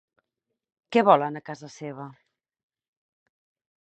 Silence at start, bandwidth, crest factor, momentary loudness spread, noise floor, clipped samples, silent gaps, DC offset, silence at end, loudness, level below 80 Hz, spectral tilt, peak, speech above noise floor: 0.9 s; 8.4 kHz; 26 dB; 21 LU; -84 dBFS; under 0.1%; none; under 0.1%; 1.7 s; -22 LUFS; -78 dBFS; -6 dB/octave; -4 dBFS; 60 dB